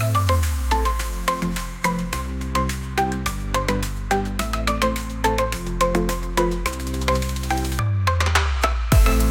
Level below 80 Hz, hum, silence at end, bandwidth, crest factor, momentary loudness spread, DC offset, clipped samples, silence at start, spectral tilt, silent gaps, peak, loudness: -26 dBFS; none; 0 s; 17 kHz; 16 dB; 6 LU; under 0.1%; under 0.1%; 0 s; -5 dB/octave; none; -4 dBFS; -22 LUFS